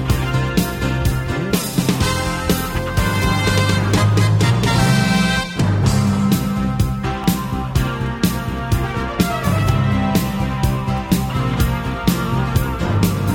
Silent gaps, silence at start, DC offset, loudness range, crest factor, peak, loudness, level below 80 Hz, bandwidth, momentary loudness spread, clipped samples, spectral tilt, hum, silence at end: none; 0 s; under 0.1%; 3 LU; 16 dB; 0 dBFS; -18 LUFS; -28 dBFS; 17.5 kHz; 5 LU; under 0.1%; -5.5 dB/octave; none; 0 s